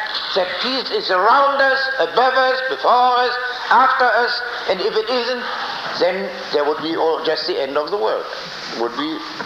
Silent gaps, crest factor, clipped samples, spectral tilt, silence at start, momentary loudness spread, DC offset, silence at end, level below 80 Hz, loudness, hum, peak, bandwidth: none; 16 dB; under 0.1%; -3.5 dB/octave; 0 s; 10 LU; under 0.1%; 0 s; -62 dBFS; -18 LUFS; none; -2 dBFS; 14.5 kHz